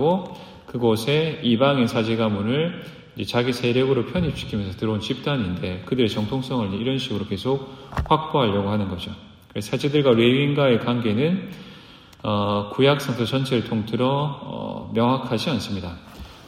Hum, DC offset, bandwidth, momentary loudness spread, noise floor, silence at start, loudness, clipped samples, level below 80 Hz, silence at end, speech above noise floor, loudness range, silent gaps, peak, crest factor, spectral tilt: none; under 0.1%; 15.5 kHz; 13 LU; -45 dBFS; 0 s; -22 LUFS; under 0.1%; -48 dBFS; 0 s; 24 dB; 4 LU; none; -4 dBFS; 18 dB; -6.5 dB/octave